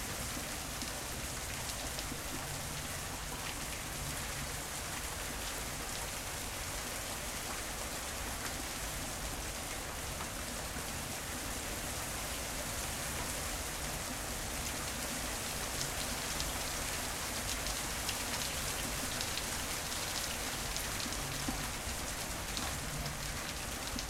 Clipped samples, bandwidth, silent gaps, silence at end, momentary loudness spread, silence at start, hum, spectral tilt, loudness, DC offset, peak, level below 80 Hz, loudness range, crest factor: under 0.1%; 16 kHz; none; 0 s; 3 LU; 0 s; none; -2 dB/octave; -38 LUFS; under 0.1%; -16 dBFS; -48 dBFS; 3 LU; 22 dB